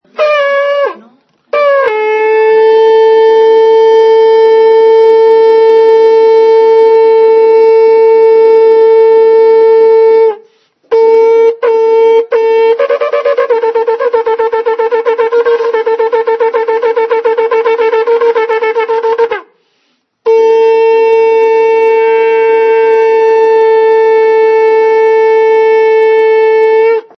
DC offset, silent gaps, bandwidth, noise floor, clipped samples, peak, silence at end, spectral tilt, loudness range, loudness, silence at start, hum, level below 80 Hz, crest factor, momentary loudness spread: under 0.1%; none; 6.2 kHz; -58 dBFS; 0.3%; 0 dBFS; 0.2 s; -3 dB/octave; 5 LU; -7 LUFS; 0.2 s; none; -66 dBFS; 6 dB; 6 LU